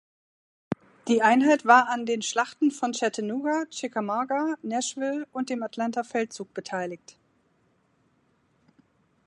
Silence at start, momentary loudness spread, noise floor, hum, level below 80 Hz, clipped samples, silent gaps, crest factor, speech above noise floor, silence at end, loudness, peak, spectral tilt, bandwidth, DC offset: 0.7 s; 15 LU; -67 dBFS; none; -76 dBFS; under 0.1%; none; 22 dB; 42 dB; 2.3 s; -26 LUFS; -4 dBFS; -3.5 dB/octave; 11 kHz; under 0.1%